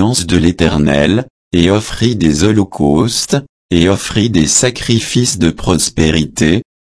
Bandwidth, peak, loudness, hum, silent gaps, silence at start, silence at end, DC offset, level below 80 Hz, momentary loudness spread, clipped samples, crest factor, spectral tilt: 11 kHz; 0 dBFS; -12 LUFS; none; 1.30-1.51 s, 3.49-3.69 s; 0 s; 0.2 s; under 0.1%; -30 dBFS; 4 LU; under 0.1%; 12 dB; -4.5 dB/octave